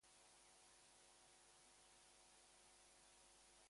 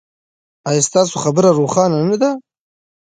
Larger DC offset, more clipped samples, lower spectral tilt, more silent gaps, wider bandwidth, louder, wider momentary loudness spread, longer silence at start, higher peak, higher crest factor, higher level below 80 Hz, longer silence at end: neither; neither; second, -0.5 dB/octave vs -5 dB/octave; neither; first, 11.5 kHz vs 9.6 kHz; second, -68 LUFS vs -15 LUFS; second, 0 LU vs 7 LU; second, 0 s vs 0.65 s; second, -56 dBFS vs 0 dBFS; about the same, 14 dB vs 16 dB; second, -88 dBFS vs -60 dBFS; second, 0 s vs 0.65 s